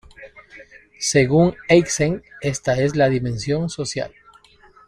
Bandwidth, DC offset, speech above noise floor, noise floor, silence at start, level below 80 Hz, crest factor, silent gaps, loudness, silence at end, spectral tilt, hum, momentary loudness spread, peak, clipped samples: 14.5 kHz; under 0.1%; 32 dB; -51 dBFS; 0.2 s; -48 dBFS; 18 dB; none; -19 LUFS; 0.8 s; -5 dB/octave; none; 10 LU; -2 dBFS; under 0.1%